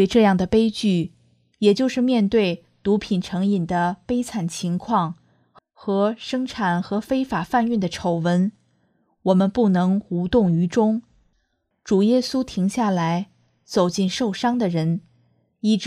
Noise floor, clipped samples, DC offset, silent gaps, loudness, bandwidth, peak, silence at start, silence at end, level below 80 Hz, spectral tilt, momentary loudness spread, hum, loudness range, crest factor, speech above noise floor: -70 dBFS; under 0.1%; under 0.1%; none; -21 LUFS; 13.5 kHz; -4 dBFS; 0 s; 0 s; -52 dBFS; -6.5 dB/octave; 8 LU; none; 3 LU; 18 dB; 50 dB